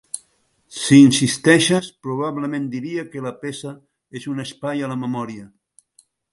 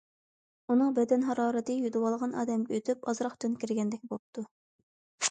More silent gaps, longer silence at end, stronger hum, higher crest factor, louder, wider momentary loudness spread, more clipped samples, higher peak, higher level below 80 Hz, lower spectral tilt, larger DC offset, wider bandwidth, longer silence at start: second, none vs 4.19-4.33 s, 4.51-5.18 s; first, 0.85 s vs 0 s; neither; about the same, 20 dB vs 18 dB; first, -19 LUFS vs -31 LUFS; first, 21 LU vs 13 LU; neither; first, 0 dBFS vs -14 dBFS; first, -60 dBFS vs -78 dBFS; about the same, -4.5 dB/octave vs -4.5 dB/octave; neither; first, 11.5 kHz vs 9.4 kHz; second, 0.15 s vs 0.7 s